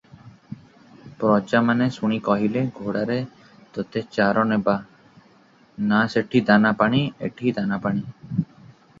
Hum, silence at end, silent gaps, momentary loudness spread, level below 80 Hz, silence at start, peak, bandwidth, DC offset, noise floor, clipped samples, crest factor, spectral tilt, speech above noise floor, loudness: none; 0.55 s; none; 14 LU; -60 dBFS; 0.25 s; -4 dBFS; 7.4 kHz; under 0.1%; -55 dBFS; under 0.1%; 20 dB; -7.5 dB/octave; 34 dB; -22 LUFS